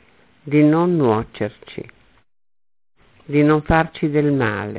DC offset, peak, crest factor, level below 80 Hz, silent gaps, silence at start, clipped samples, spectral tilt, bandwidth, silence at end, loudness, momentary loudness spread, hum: under 0.1%; -2 dBFS; 16 dB; -40 dBFS; none; 0.45 s; under 0.1%; -11.5 dB/octave; 4 kHz; 0 s; -18 LUFS; 13 LU; none